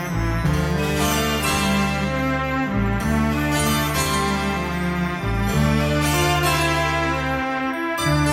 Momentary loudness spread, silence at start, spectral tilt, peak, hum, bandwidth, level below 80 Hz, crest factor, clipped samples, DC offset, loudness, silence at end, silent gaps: 5 LU; 0 s; -4.5 dB/octave; -6 dBFS; none; 16.5 kHz; -30 dBFS; 14 dB; under 0.1%; under 0.1%; -21 LUFS; 0 s; none